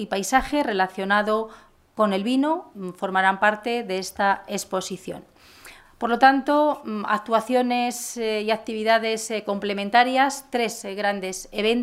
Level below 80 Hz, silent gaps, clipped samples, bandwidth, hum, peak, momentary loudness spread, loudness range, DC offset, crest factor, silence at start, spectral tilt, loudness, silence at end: -54 dBFS; none; under 0.1%; 16 kHz; none; -2 dBFS; 10 LU; 2 LU; under 0.1%; 20 dB; 0 s; -3.5 dB/octave; -23 LUFS; 0 s